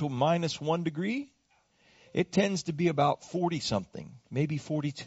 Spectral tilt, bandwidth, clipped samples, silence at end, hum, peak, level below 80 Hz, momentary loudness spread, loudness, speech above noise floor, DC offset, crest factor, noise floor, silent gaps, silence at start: -5.5 dB/octave; 8 kHz; under 0.1%; 0 s; none; -12 dBFS; -64 dBFS; 9 LU; -30 LUFS; 39 dB; under 0.1%; 18 dB; -69 dBFS; none; 0 s